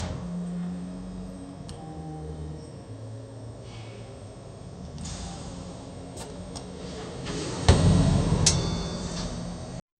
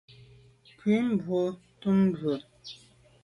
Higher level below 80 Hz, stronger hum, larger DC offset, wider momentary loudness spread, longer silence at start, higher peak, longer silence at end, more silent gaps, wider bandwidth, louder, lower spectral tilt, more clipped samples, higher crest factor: first, -38 dBFS vs -66 dBFS; neither; neither; about the same, 20 LU vs 20 LU; second, 0 s vs 0.85 s; first, -4 dBFS vs -14 dBFS; second, 0.2 s vs 0.5 s; neither; about the same, 11.5 kHz vs 10.5 kHz; about the same, -29 LUFS vs -28 LUFS; second, -5 dB/octave vs -8 dB/octave; neither; first, 26 dB vs 14 dB